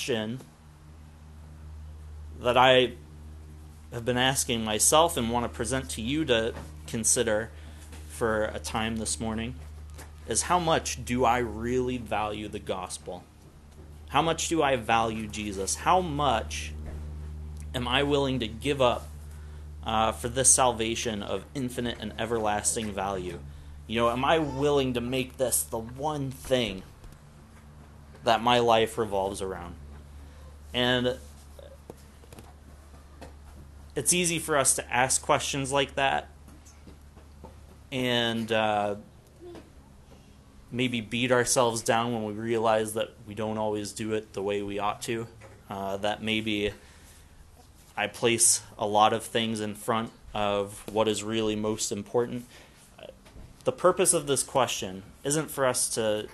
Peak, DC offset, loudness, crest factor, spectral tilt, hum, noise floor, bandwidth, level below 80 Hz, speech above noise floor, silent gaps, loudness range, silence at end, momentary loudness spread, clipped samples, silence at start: -6 dBFS; under 0.1%; -27 LUFS; 22 dB; -3 dB/octave; none; -53 dBFS; 13 kHz; -46 dBFS; 26 dB; none; 5 LU; 0 s; 21 LU; under 0.1%; 0 s